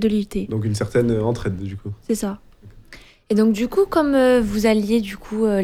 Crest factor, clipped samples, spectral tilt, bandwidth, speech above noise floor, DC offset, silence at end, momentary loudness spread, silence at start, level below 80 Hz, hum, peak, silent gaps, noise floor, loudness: 12 dB; under 0.1%; -6.5 dB/octave; 15.5 kHz; 26 dB; under 0.1%; 0 s; 12 LU; 0 s; -42 dBFS; none; -6 dBFS; none; -45 dBFS; -20 LUFS